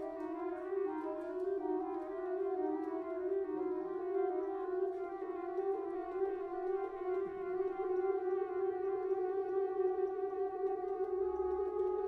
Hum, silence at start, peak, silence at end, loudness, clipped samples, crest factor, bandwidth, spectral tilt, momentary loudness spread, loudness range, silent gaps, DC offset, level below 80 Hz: none; 0 s; -24 dBFS; 0 s; -38 LUFS; under 0.1%; 12 dB; 3.7 kHz; -8 dB/octave; 5 LU; 2 LU; none; under 0.1%; -70 dBFS